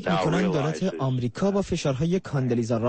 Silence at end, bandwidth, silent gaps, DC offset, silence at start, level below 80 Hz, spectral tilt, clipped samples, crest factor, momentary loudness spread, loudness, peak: 0 s; 8.8 kHz; none; under 0.1%; 0 s; -50 dBFS; -6.5 dB/octave; under 0.1%; 12 dB; 4 LU; -25 LUFS; -12 dBFS